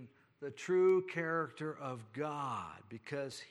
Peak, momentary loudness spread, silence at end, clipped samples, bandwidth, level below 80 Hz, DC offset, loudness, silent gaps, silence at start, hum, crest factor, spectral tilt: -22 dBFS; 18 LU; 0 s; under 0.1%; 11.5 kHz; -84 dBFS; under 0.1%; -37 LUFS; none; 0 s; none; 14 dB; -6 dB/octave